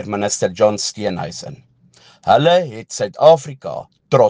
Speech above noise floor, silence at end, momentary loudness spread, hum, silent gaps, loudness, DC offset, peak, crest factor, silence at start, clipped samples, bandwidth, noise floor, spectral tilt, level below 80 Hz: 33 dB; 0 s; 17 LU; none; none; -16 LUFS; under 0.1%; 0 dBFS; 16 dB; 0 s; under 0.1%; 10 kHz; -50 dBFS; -4.5 dB/octave; -58 dBFS